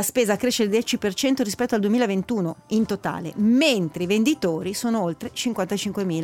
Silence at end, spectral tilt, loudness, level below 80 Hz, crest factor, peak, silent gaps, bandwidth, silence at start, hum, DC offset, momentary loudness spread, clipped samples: 0 s; -4.5 dB/octave; -23 LUFS; -58 dBFS; 14 dB; -8 dBFS; none; 16.5 kHz; 0 s; none; under 0.1%; 6 LU; under 0.1%